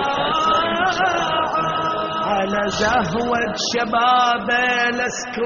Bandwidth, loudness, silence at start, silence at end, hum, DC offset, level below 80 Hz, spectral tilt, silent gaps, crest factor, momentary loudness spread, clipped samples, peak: 7.4 kHz; -19 LUFS; 0 s; 0 s; none; under 0.1%; -48 dBFS; -1.5 dB/octave; none; 14 dB; 4 LU; under 0.1%; -4 dBFS